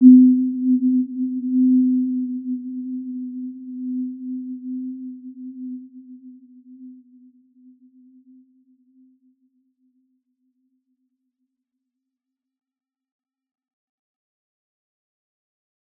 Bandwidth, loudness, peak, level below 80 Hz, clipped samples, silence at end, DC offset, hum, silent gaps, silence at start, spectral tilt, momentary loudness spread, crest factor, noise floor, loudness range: 0.4 kHz; -21 LUFS; -2 dBFS; -90 dBFS; under 0.1%; 9.05 s; under 0.1%; none; none; 0 s; -16 dB/octave; 24 LU; 22 dB; -84 dBFS; 20 LU